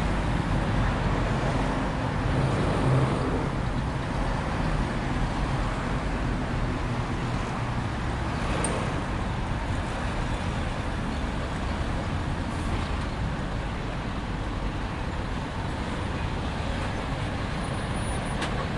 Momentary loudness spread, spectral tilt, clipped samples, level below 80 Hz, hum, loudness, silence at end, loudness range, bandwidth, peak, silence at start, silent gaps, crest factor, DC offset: 5 LU; -6 dB/octave; under 0.1%; -34 dBFS; none; -29 LUFS; 0 s; 5 LU; 11.5 kHz; -12 dBFS; 0 s; none; 16 dB; under 0.1%